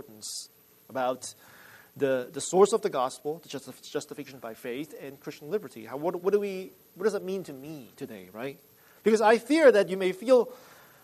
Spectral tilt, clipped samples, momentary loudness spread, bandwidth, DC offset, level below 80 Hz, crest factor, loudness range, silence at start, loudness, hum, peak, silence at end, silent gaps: -4.5 dB/octave; under 0.1%; 19 LU; 13.5 kHz; under 0.1%; -78 dBFS; 20 dB; 9 LU; 0.1 s; -27 LUFS; none; -8 dBFS; 0.45 s; none